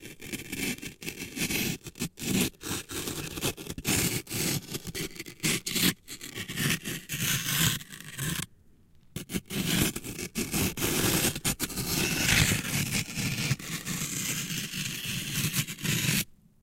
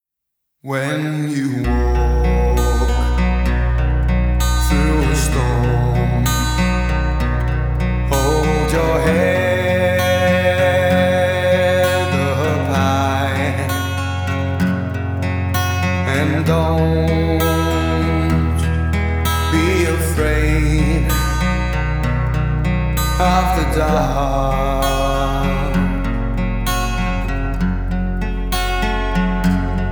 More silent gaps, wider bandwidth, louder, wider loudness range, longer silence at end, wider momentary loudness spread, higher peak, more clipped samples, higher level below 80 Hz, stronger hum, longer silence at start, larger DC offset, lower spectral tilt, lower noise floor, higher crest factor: neither; second, 17 kHz vs over 20 kHz; second, -29 LUFS vs -17 LUFS; about the same, 4 LU vs 4 LU; first, 0.3 s vs 0 s; first, 11 LU vs 6 LU; second, -6 dBFS vs -2 dBFS; neither; second, -48 dBFS vs -20 dBFS; neither; second, 0 s vs 0.65 s; neither; second, -3 dB/octave vs -6 dB/octave; second, -57 dBFS vs -77 dBFS; first, 26 dB vs 14 dB